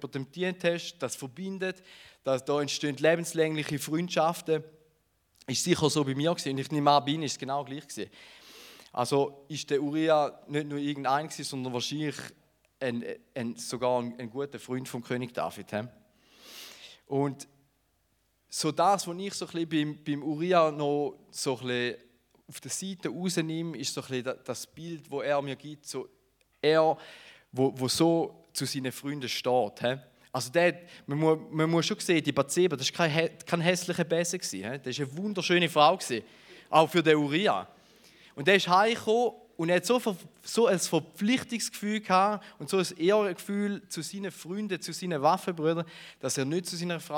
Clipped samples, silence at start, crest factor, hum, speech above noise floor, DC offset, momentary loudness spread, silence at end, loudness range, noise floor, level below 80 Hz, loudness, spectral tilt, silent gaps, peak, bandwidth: under 0.1%; 0 s; 22 dB; none; 43 dB; under 0.1%; 14 LU; 0 s; 8 LU; -72 dBFS; -76 dBFS; -29 LUFS; -4.5 dB/octave; none; -6 dBFS; 19 kHz